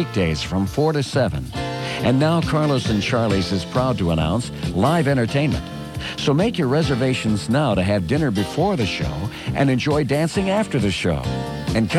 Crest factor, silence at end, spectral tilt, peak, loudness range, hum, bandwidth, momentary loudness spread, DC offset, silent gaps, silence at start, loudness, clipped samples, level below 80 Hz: 14 dB; 0 s; -6 dB/octave; -4 dBFS; 1 LU; none; 13.5 kHz; 7 LU; under 0.1%; none; 0 s; -20 LUFS; under 0.1%; -38 dBFS